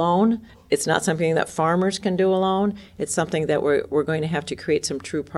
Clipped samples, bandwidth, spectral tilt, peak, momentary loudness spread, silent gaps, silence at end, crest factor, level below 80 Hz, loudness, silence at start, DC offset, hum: under 0.1%; 13.5 kHz; -5 dB/octave; -6 dBFS; 6 LU; none; 0 s; 16 dB; -56 dBFS; -22 LUFS; 0 s; under 0.1%; none